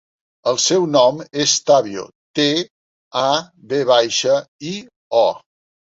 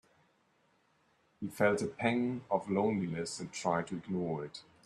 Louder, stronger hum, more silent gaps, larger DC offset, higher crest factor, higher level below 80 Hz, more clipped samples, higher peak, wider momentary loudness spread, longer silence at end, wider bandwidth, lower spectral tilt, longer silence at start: first, -17 LUFS vs -34 LUFS; neither; first, 2.15-2.34 s, 2.70-3.11 s, 4.48-4.59 s, 4.96-5.11 s vs none; neither; about the same, 16 dB vs 20 dB; first, -64 dBFS vs -72 dBFS; neither; first, -2 dBFS vs -16 dBFS; first, 14 LU vs 9 LU; first, 0.5 s vs 0.25 s; second, 8 kHz vs 13 kHz; second, -3 dB/octave vs -5.5 dB/octave; second, 0.45 s vs 1.4 s